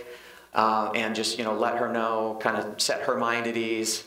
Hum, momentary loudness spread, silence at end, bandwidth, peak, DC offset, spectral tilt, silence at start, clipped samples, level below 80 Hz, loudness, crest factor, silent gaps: none; 4 LU; 0 s; 16 kHz; -8 dBFS; under 0.1%; -2.5 dB/octave; 0 s; under 0.1%; -72 dBFS; -26 LUFS; 20 dB; none